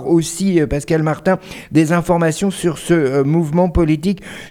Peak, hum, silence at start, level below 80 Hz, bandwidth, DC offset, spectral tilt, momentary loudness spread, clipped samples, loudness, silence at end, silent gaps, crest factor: -2 dBFS; none; 0 s; -32 dBFS; 15.5 kHz; under 0.1%; -6.5 dB/octave; 4 LU; under 0.1%; -16 LUFS; 0 s; none; 14 dB